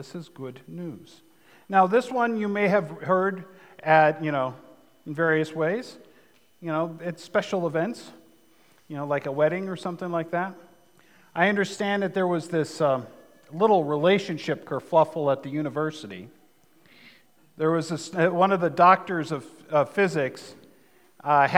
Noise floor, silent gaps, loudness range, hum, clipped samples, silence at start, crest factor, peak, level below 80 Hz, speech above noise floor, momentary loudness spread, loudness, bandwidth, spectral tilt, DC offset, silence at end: -61 dBFS; none; 6 LU; none; under 0.1%; 0 s; 26 dB; 0 dBFS; -80 dBFS; 36 dB; 18 LU; -25 LUFS; 17 kHz; -6 dB/octave; under 0.1%; 0 s